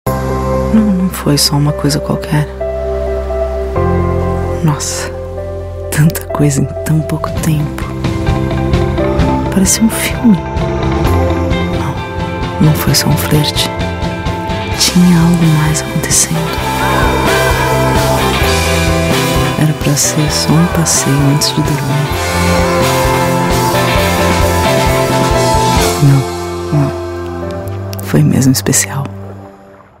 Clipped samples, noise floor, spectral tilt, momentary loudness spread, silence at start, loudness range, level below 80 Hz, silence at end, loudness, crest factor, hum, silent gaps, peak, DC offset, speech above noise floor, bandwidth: under 0.1%; -38 dBFS; -4.5 dB/octave; 9 LU; 0.05 s; 4 LU; -24 dBFS; 0.25 s; -12 LUFS; 12 dB; none; none; 0 dBFS; under 0.1%; 27 dB; 16.5 kHz